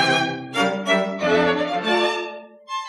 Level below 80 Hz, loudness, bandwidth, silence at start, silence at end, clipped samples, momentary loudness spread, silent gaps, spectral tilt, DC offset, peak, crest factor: -64 dBFS; -21 LUFS; 12.5 kHz; 0 s; 0 s; under 0.1%; 11 LU; none; -4 dB/octave; under 0.1%; -6 dBFS; 16 dB